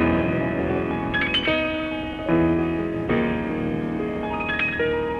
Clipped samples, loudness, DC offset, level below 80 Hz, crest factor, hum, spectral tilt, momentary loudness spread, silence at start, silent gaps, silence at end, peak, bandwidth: under 0.1%; -23 LUFS; under 0.1%; -40 dBFS; 14 dB; none; -7.5 dB/octave; 6 LU; 0 s; none; 0 s; -10 dBFS; 6.6 kHz